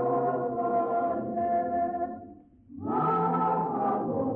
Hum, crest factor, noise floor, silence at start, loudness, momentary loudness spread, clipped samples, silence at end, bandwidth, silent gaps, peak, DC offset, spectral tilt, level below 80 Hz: none; 12 dB; -50 dBFS; 0 s; -28 LUFS; 9 LU; under 0.1%; 0 s; 3.7 kHz; none; -16 dBFS; under 0.1%; -11.5 dB/octave; -64 dBFS